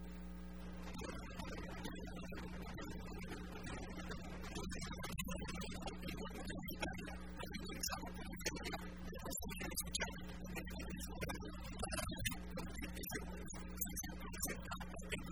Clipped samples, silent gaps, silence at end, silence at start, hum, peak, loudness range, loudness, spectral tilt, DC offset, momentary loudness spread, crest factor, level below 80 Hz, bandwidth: under 0.1%; none; 0 s; 0 s; none; -24 dBFS; 4 LU; -47 LUFS; -3.5 dB/octave; 0.2%; 7 LU; 22 dB; -52 dBFS; 19.5 kHz